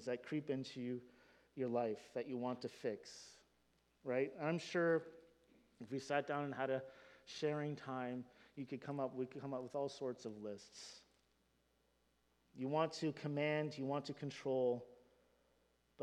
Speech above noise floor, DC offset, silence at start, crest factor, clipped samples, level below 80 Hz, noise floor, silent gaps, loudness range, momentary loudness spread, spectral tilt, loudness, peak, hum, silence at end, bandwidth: 37 dB; under 0.1%; 0 s; 22 dB; under 0.1%; -84 dBFS; -79 dBFS; none; 5 LU; 16 LU; -6 dB/octave; -43 LUFS; -22 dBFS; none; 0 s; 11.5 kHz